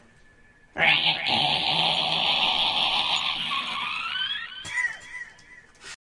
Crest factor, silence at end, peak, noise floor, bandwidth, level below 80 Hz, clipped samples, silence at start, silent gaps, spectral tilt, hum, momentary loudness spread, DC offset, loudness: 20 dB; 0.1 s; -6 dBFS; -55 dBFS; 11.5 kHz; -58 dBFS; under 0.1%; 0.75 s; none; -2 dB/octave; none; 16 LU; under 0.1%; -23 LUFS